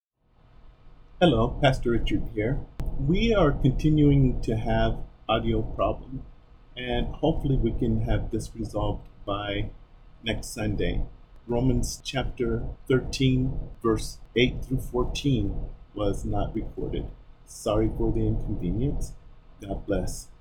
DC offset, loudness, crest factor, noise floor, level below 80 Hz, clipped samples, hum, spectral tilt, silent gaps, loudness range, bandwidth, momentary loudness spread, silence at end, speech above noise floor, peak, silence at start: under 0.1%; -27 LUFS; 20 dB; -60 dBFS; -32 dBFS; under 0.1%; none; -6.5 dB/octave; none; 6 LU; 14.5 kHz; 13 LU; 0.1 s; 35 dB; -6 dBFS; 0.65 s